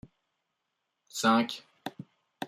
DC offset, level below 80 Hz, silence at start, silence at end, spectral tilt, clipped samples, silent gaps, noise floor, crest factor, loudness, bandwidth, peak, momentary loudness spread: under 0.1%; -74 dBFS; 1.15 s; 0 s; -3.5 dB/octave; under 0.1%; none; -83 dBFS; 22 dB; -28 LUFS; 15.5 kHz; -12 dBFS; 18 LU